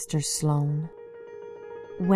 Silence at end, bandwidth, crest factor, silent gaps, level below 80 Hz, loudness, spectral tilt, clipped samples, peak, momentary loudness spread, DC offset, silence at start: 0 s; 14 kHz; 20 dB; none; -58 dBFS; -27 LUFS; -5.5 dB/octave; under 0.1%; -8 dBFS; 18 LU; under 0.1%; 0 s